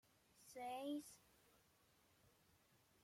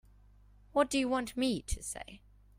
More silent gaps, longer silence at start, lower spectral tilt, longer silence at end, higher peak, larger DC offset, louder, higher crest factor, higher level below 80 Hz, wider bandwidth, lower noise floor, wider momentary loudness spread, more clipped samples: neither; second, 0.35 s vs 0.75 s; about the same, -3.5 dB/octave vs -4 dB/octave; first, 0.75 s vs 0.4 s; second, -38 dBFS vs -14 dBFS; neither; second, -51 LUFS vs -34 LUFS; about the same, 18 dB vs 22 dB; second, -88 dBFS vs -50 dBFS; about the same, 16.5 kHz vs 16 kHz; first, -77 dBFS vs -60 dBFS; first, 19 LU vs 13 LU; neither